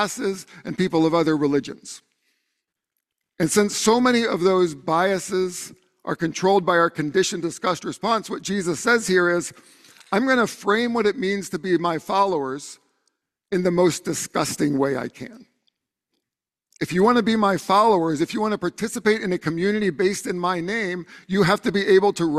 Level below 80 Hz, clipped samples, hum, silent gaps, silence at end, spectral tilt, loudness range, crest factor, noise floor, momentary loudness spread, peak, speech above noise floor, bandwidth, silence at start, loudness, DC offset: -60 dBFS; under 0.1%; none; none; 0 s; -4.5 dB/octave; 4 LU; 18 dB; -87 dBFS; 11 LU; -4 dBFS; 66 dB; 14 kHz; 0 s; -21 LUFS; under 0.1%